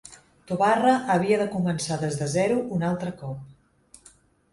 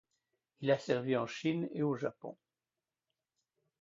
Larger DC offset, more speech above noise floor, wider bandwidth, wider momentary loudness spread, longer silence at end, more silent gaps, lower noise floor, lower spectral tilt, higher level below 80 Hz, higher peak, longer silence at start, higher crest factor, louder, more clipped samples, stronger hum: neither; second, 33 dB vs over 55 dB; first, 11.5 kHz vs 7.4 kHz; first, 13 LU vs 9 LU; second, 1 s vs 1.45 s; neither; second, -56 dBFS vs under -90 dBFS; about the same, -5.5 dB/octave vs -5.5 dB/octave; first, -60 dBFS vs -80 dBFS; first, -8 dBFS vs -16 dBFS; second, 0.05 s vs 0.6 s; about the same, 18 dB vs 20 dB; first, -24 LUFS vs -35 LUFS; neither; neither